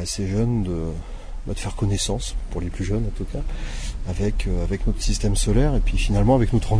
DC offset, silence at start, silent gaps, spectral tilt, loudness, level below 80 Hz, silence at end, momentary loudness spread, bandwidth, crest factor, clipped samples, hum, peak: under 0.1%; 0 s; none; -5.5 dB/octave; -24 LUFS; -24 dBFS; 0 s; 12 LU; 10.5 kHz; 16 dB; under 0.1%; none; -6 dBFS